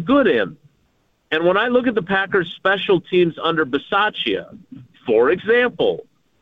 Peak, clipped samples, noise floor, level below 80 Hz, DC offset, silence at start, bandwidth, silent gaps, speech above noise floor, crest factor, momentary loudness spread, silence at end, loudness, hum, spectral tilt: -4 dBFS; under 0.1%; -63 dBFS; -54 dBFS; under 0.1%; 0 s; 5.4 kHz; none; 45 dB; 14 dB; 7 LU; 0.4 s; -18 LUFS; none; -7.5 dB/octave